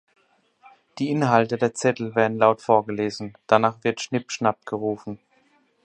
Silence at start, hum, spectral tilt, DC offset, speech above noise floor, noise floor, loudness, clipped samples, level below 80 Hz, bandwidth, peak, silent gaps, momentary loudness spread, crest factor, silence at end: 0.95 s; none; -5.5 dB/octave; under 0.1%; 40 dB; -63 dBFS; -23 LUFS; under 0.1%; -66 dBFS; 10.5 kHz; -2 dBFS; none; 10 LU; 22 dB; 0.7 s